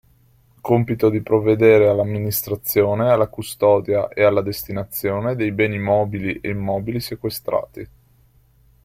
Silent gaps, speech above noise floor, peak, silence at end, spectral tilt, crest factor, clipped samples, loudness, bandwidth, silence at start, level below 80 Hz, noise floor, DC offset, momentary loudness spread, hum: none; 37 dB; -2 dBFS; 1 s; -6.5 dB/octave; 16 dB; under 0.1%; -19 LUFS; 16.5 kHz; 0.65 s; -50 dBFS; -55 dBFS; under 0.1%; 11 LU; none